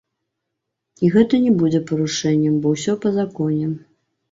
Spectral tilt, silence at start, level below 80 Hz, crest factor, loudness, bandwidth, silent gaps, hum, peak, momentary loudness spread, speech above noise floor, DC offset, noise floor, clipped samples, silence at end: -6.5 dB/octave; 1 s; -58 dBFS; 16 dB; -19 LUFS; 8 kHz; none; none; -4 dBFS; 6 LU; 61 dB; under 0.1%; -79 dBFS; under 0.1%; 0.55 s